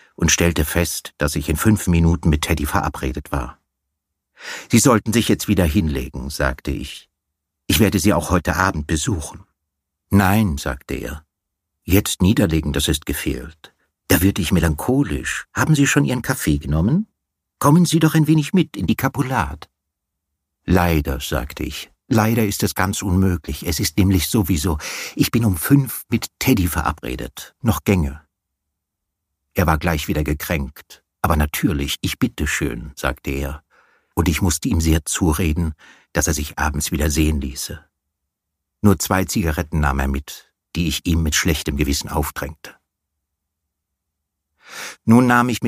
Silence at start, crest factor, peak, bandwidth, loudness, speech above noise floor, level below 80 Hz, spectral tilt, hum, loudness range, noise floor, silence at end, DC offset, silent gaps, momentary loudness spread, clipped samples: 0.2 s; 20 dB; 0 dBFS; 15.5 kHz; -19 LUFS; 61 dB; -30 dBFS; -5 dB/octave; none; 4 LU; -79 dBFS; 0 s; under 0.1%; none; 12 LU; under 0.1%